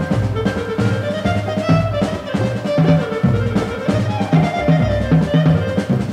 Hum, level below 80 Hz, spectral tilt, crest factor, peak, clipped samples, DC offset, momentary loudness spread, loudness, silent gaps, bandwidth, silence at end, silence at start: none; -34 dBFS; -7.5 dB/octave; 14 dB; -2 dBFS; under 0.1%; under 0.1%; 5 LU; -17 LUFS; none; 10.5 kHz; 0 s; 0 s